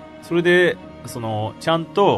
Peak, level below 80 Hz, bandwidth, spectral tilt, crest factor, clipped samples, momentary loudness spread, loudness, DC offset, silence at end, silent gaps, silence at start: -4 dBFS; -54 dBFS; 13.5 kHz; -6 dB/octave; 16 dB; under 0.1%; 15 LU; -20 LUFS; under 0.1%; 0 s; none; 0 s